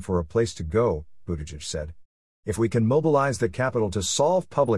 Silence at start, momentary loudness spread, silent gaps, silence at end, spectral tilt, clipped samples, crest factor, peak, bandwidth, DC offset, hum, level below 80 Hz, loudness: 0 s; 12 LU; 2.05-2.43 s; 0 s; -5.5 dB/octave; under 0.1%; 16 dB; -8 dBFS; 12 kHz; 0.4%; none; -46 dBFS; -25 LUFS